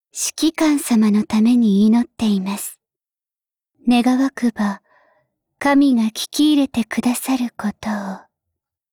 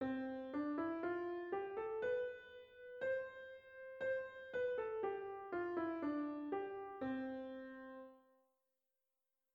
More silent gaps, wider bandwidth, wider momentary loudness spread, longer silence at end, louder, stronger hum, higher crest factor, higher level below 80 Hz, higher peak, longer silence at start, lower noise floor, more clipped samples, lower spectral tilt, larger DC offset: neither; first, 19.5 kHz vs 7 kHz; about the same, 11 LU vs 13 LU; second, 0.75 s vs 1.35 s; first, -18 LUFS vs -44 LUFS; neither; about the same, 12 dB vs 14 dB; first, -56 dBFS vs -78 dBFS; first, -6 dBFS vs -30 dBFS; first, 0.15 s vs 0 s; about the same, under -90 dBFS vs under -90 dBFS; neither; second, -4.5 dB/octave vs -7.5 dB/octave; neither